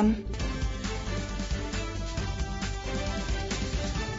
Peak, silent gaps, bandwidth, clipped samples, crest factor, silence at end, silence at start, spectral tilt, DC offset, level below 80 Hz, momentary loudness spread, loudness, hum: -14 dBFS; none; 7.8 kHz; under 0.1%; 16 dB; 0 s; 0 s; -5 dB/octave; under 0.1%; -34 dBFS; 2 LU; -33 LUFS; none